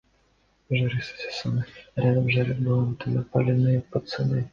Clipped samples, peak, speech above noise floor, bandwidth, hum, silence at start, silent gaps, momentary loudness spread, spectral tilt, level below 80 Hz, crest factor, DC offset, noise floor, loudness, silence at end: under 0.1%; -8 dBFS; 41 dB; 7 kHz; none; 0.7 s; none; 9 LU; -8 dB/octave; -54 dBFS; 16 dB; under 0.1%; -65 dBFS; -25 LUFS; 0.05 s